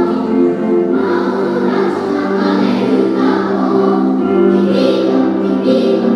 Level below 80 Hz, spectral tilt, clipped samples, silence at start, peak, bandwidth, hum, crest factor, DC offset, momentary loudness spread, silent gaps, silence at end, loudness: -64 dBFS; -8 dB/octave; under 0.1%; 0 s; 0 dBFS; 10 kHz; none; 12 dB; under 0.1%; 3 LU; none; 0 s; -13 LUFS